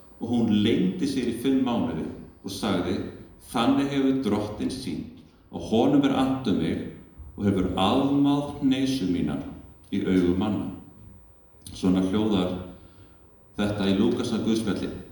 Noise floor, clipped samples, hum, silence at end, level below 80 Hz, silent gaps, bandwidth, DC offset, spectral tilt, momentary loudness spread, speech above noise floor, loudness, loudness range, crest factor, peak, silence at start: -53 dBFS; under 0.1%; none; 0 s; -50 dBFS; none; 19 kHz; under 0.1%; -6.5 dB/octave; 17 LU; 28 dB; -25 LUFS; 3 LU; 18 dB; -8 dBFS; 0.2 s